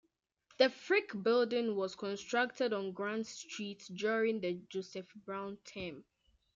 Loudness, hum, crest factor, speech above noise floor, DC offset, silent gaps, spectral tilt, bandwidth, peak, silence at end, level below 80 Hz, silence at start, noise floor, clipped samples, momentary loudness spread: -36 LUFS; none; 22 dB; 36 dB; under 0.1%; none; -4.5 dB/octave; 7.8 kHz; -14 dBFS; 0.55 s; -78 dBFS; 0.6 s; -72 dBFS; under 0.1%; 13 LU